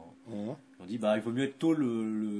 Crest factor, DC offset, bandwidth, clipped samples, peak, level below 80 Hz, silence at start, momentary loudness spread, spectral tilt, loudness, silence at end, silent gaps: 16 dB; under 0.1%; 11 kHz; under 0.1%; -16 dBFS; -78 dBFS; 0 s; 12 LU; -7 dB/octave; -32 LUFS; 0 s; none